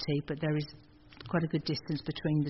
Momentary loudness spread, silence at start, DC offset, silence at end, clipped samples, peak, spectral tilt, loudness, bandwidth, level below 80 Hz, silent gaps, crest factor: 6 LU; 0 s; under 0.1%; 0 s; under 0.1%; -16 dBFS; -6 dB/octave; -34 LUFS; 6 kHz; -60 dBFS; none; 16 dB